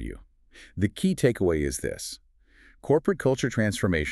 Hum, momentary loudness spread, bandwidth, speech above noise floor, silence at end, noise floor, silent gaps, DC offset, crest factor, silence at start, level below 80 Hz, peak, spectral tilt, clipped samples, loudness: none; 18 LU; 13.5 kHz; 32 dB; 0 s; -57 dBFS; none; under 0.1%; 18 dB; 0 s; -44 dBFS; -8 dBFS; -5.5 dB/octave; under 0.1%; -26 LUFS